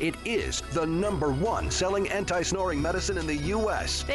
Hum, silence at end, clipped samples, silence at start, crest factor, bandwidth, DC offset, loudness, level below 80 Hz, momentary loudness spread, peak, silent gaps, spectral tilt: none; 0 s; under 0.1%; 0 s; 10 dB; 11.5 kHz; under 0.1%; -28 LUFS; -38 dBFS; 2 LU; -18 dBFS; none; -4 dB/octave